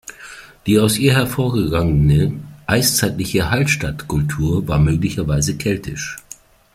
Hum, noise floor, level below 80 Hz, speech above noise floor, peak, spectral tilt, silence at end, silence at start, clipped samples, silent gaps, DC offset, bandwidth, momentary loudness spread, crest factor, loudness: none; -42 dBFS; -34 dBFS; 26 dB; -2 dBFS; -5 dB/octave; 0.55 s; 0.1 s; under 0.1%; none; under 0.1%; 16 kHz; 13 LU; 16 dB; -17 LUFS